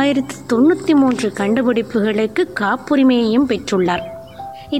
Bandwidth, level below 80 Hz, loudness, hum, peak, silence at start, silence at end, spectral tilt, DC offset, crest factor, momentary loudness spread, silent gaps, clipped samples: 13 kHz; -50 dBFS; -16 LUFS; none; -4 dBFS; 0 s; 0 s; -5.5 dB/octave; 0.3%; 12 dB; 9 LU; none; under 0.1%